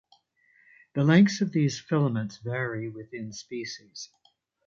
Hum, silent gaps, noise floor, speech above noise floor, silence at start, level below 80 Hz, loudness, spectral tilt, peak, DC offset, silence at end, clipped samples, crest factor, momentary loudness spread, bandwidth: none; none; -65 dBFS; 38 dB; 0.95 s; -68 dBFS; -26 LUFS; -6.5 dB/octave; -8 dBFS; under 0.1%; 0.65 s; under 0.1%; 20 dB; 19 LU; 7.6 kHz